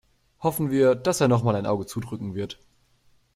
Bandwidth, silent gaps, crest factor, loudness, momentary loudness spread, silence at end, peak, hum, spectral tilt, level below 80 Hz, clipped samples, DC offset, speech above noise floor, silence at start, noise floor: 15.5 kHz; none; 18 dB; -24 LUFS; 12 LU; 0.8 s; -6 dBFS; none; -6 dB/octave; -58 dBFS; under 0.1%; under 0.1%; 38 dB; 0.4 s; -62 dBFS